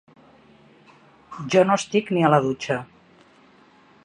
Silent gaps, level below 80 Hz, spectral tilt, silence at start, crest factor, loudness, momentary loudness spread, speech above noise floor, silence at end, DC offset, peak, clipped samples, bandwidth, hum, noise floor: none; -64 dBFS; -5.5 dB/octave; 1.3 s; 22 dB; -21 LUFS; 13 LU; 34 dB; 1.2 s; under 0.1%; -4 dBFS; under 0.1%; 10.5 kHz; none; -54 dBFS